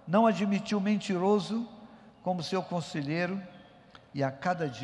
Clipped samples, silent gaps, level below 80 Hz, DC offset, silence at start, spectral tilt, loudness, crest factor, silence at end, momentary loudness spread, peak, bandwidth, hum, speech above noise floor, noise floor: under 0.1%; none; -72 dBFS; under 0.1%; 0.05 s; -6.5 dB/octave; -30 LUFS; 18 dB; 0 s; 13 LU; -12 dBFS; 11.5 kHz; none; 26 dB; -55 dBFS